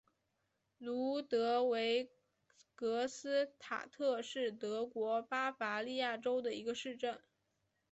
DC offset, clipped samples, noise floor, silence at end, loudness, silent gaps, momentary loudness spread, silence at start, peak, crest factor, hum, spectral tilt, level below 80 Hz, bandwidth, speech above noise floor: under 0.1%; under 0.1%; -84 dBFS; 0.75 s; -38 LUFS; none; 9 LU; 0.8 s; -24 dBFS; 14 dB; none; -3 dB/octave; -84 dBFS; 8.2 kHz; 46 dB